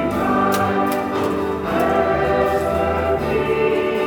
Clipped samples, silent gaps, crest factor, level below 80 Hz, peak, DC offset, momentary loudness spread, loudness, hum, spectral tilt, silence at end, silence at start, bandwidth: under 0.1%; none; 14 dB; -40 dBFS; -4 dBFS; under 0.1%; 3 LU; -19 LUFS; none; -6 dB/octave; 0 s; 0 s; 19 kHz